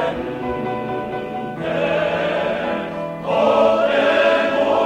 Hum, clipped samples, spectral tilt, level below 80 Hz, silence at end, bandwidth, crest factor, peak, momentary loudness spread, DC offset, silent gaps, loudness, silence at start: none; under 0.1%; -6 dB/octave; -48 dBFS; 0 s; 9.6 kHz; 14 dB; -4 dBFS; 11 LU; under 0.1%; none; -19 LUFS; 0 s